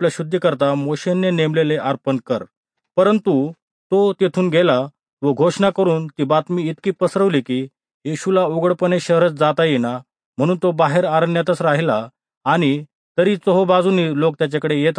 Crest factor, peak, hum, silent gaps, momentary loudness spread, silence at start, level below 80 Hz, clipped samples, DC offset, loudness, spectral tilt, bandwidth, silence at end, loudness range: 16 dB; -2 dBFS; none; 2.57-2.63 s, 3.62-3.90 s, 5.13-5.17 s, 7.94-8.01 s, 10.26-10.33 s, 12.37-12.41 s, 12.95-13.15 s; 9 LU; 0 s; -66 dBFS; under 0.1%; under 0.1%; -18 LUFS; -6.5 dB/octave; 10.5 kHz; 0 s; 2 LU